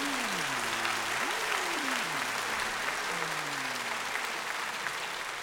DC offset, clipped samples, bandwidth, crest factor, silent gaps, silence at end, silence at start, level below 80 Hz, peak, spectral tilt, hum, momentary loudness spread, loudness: under 0.1%; under 0.1%; over 20 kHz; 20 dB; none; 0 s; 0 s; -64 dBFS; -14 dBFS; -1 dB/octave; none; 4 LU; -31 LUFS